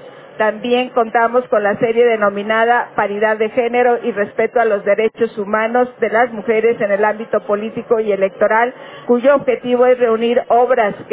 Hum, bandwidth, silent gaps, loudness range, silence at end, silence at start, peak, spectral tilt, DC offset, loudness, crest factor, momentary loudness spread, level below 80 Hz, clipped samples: none; 4 kHz; none; 2 LU; 0 s; 0 s; -2 dBFS; -8.5 dB/octave; under 0.1%; -15 LUFS; 12 dB; 5 LU; -58 dBFS; under 0.1%